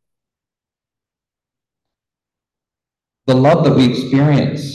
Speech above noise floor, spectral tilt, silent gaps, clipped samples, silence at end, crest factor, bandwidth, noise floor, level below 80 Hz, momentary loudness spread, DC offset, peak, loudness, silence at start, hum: 76 dB; -7.5 dB/octave; none; under 0.1%; 0 s; 16 dB; 12 kHz; -88 dBFS; -50 dBFS; 5 LU; under 0.1%; -2 dBFS; -13 LUFS; 3.25 s; none